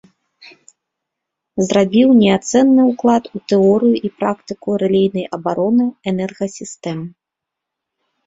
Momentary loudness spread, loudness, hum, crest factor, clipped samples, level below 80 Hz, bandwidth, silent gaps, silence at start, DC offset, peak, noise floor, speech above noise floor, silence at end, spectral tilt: 14 LU; -15 LUFS; none; 16 dB; under 0.1%; -56 dBFS; 8 kHz; none; 1.55 s; under 0.1%; -2 dBFS; -82 dBFS; 67 dB; 1.15 s; -6 dB/octave